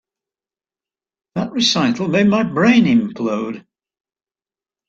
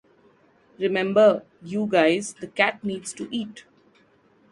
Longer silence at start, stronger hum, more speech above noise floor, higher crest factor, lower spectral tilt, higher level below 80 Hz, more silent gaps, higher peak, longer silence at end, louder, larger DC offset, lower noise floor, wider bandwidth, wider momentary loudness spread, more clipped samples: first, 1.35 s vs 0.8 s; neither; first, over 75 dB vs 37 dB; second, 16 dB vs 22 dB; about the same, -5 dB/octave vs -4.5 dB/octave; first, -58 dBFS vs -70 dBFS; neither; about the same, -2 dBFS vs -4 dBFS; first, 1.3 s vs 0.9 s; first, -16 LUFS vs -23 LUFS; neither; first, under -90 dBFS vs -59 dBFS; second, 7.8 kHz vs 11.5 kHz; about the same, 14 LU vs 14 LU; neither